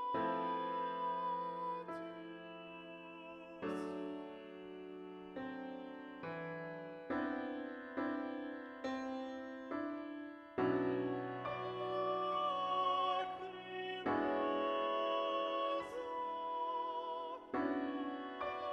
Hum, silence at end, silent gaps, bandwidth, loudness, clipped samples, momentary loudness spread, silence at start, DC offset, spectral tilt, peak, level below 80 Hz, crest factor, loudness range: none; 0 s; none; 9.8 kHz; -41 LUFS; under 0.1%; 14 LU; 0 s; under 0.1%; -6.5 dB/octave; -24 dBFS; -76 dBFS; 16 dB; 10 LU